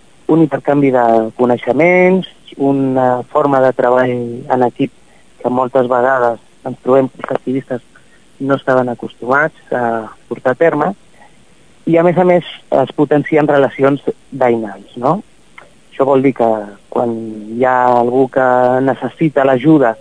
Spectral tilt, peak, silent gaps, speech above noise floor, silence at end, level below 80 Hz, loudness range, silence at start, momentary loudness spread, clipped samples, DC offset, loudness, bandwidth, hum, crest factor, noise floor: -8 dB/octave; 0 dBFS; none; 35 dB; 0.05 s; -56 dBFS; 4 LU; 0.3 s; 10 LU; 0.1%; 0.5%; -14 LUFS; 10 kHz; none; 14 dB; -48 dBFS